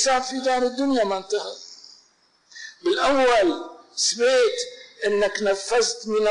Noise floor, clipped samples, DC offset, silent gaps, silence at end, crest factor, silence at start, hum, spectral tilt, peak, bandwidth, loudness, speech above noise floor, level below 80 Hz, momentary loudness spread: -61 dBFS; under 0.1%; under 0.1%; none; 0 s; 10 dB; 0 s; none; -1.5 dB/octave; -12 dBFS; 11 kHz; -22 LUFS; 40 dB; -56 dBFS; 15 LU